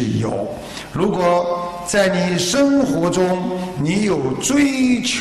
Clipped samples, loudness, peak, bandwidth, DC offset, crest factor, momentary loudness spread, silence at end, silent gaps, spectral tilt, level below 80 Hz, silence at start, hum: under 0.1%; -18 LUFS; -4 dBFS; 13 kHz; under 0.1%; 14 dB; 8 LU; 0 s; none; -4.5 dB/octave; -46 dBFS; 0 s; none